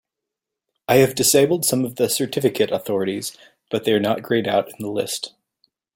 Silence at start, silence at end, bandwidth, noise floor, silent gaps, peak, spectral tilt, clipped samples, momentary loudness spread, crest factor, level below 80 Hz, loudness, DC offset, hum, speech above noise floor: 0.9 s; 0.65 s; 17 kHz; -84 dBFS; none; -2 dBFS; -4 dB/octave; under 0.1%; 13 LU; 20 dB; -60 dBFS; -20 LUFS; under 0.1%; none; 64 dB